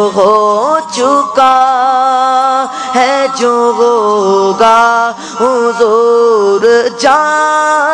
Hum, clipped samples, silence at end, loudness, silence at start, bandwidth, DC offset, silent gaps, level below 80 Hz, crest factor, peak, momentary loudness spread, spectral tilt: none; 1%; 0 s; -9 LUFS; 0 s; 11 kHz; under 0.1%; none; -54 dBFS; 8 dB; 0 dBFS; 4 LU; -3 dB/octave